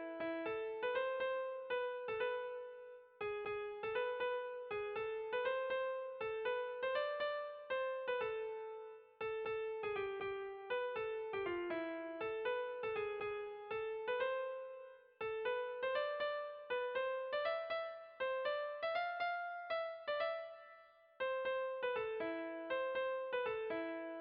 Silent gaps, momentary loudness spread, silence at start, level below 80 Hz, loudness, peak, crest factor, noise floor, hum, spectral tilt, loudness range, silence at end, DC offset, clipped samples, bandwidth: none; 7 LU; 0 s; -78 dBFS; -42 LUFS; -28 dBFS; 14 dB; -63 dBFS; none; -0.5 dB/octave; 2 LU; 0 s; under 0.1%; under 0.1%; 5.2 kHz